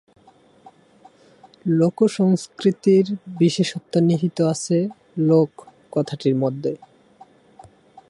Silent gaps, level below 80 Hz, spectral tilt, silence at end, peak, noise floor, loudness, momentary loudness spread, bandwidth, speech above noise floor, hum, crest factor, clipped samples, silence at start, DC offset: none; -66 dBFS; -7 dB/octave; 1.35 s; -4 dBFS; -53 dBFS; -20 LUFS; 10 LU; 11.5 kHz; 34 dB; none; 18 dB; under 0.1%; 1.65 s; under 0.1%